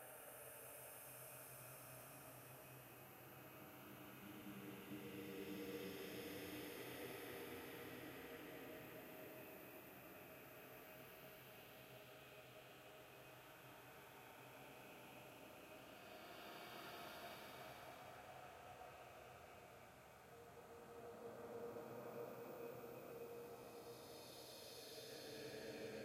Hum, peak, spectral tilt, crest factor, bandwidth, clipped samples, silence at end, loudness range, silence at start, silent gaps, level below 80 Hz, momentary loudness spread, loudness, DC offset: none; -40 dBFS; -4 dB/octave; 16 dB; 16 kHz; under 0.1%; 0 s; 7 LU; 0 s; none; -82 dBFS; 8 LU; -56 LUFS; under 0.1%